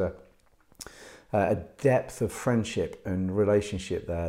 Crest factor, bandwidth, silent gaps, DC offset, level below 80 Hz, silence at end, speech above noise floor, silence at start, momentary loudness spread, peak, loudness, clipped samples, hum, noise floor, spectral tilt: 16 dB; 16 kHz; none; under 0.1%; -54 dBFS; 0 s; 35 dB; 0 s; 19 LU; -12 dBFS; -28 LUFS; under 0.1%; none; -62 dBFS; -6.5 dB/octave